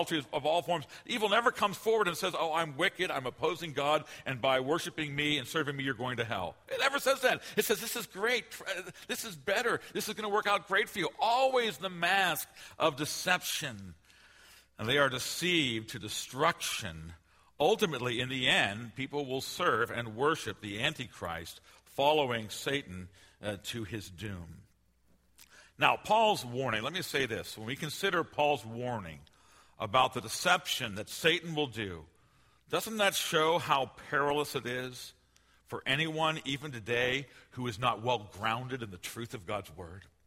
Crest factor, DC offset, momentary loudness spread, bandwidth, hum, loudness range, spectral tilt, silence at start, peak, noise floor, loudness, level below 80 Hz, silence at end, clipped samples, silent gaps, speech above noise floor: 24 dB; under 0.1%; 13 LU; 16 kHz; none; 4 LU; -3.5 dB/octave; 0 s; -8 dBFS; -68 dBFS; -32 LUFS; -64 dBFS; 0.2 s; under 0.1%; none; 36 dB